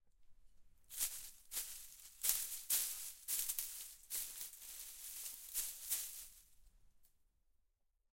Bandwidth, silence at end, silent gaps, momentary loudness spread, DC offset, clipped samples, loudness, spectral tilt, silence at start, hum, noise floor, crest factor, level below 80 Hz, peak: 16.5 kHz; 1.05 s; none; 13 LU; under 0.1%; under 0.1%; -42 LUFS; 2.5 dB/octave; 0.05 s; none; -81 dBFS; 32 dB; -70 dBFS; -16 dBFS